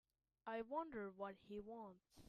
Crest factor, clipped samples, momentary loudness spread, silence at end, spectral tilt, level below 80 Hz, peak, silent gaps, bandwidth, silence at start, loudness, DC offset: 18 dB; under 0.1%; 10 LU; 0 s; -6.5 dB/octave; -78 dBFS; -34 dBFS; none; 13.5 kHz; 0.45 s; -51 LUFS; under 0.1%